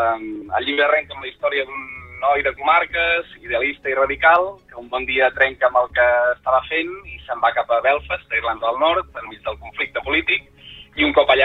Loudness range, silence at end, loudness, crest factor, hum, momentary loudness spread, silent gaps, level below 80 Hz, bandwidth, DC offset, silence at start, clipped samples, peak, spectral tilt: 3 LU; 0 s; -19 LUFS; 18 dB; none; 13 LU; none; -46 dBFS; 5 kHz; under 0.1%; 0 s; under 0.1%; -2 dBFS; -6 dB/octave